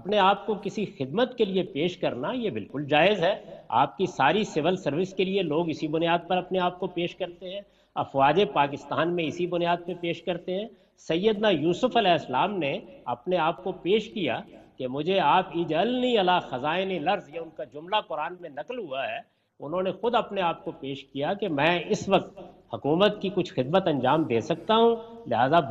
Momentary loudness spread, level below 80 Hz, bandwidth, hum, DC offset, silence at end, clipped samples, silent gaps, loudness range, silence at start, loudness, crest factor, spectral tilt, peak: 12 LU; -62 dBFS; 8 kHz; none; under 0.1%; 0 s; under 0.1%; none; 4 LU; 0 s; -26 LUFS; 18 dB; -6 dB/octave; -8 dBFS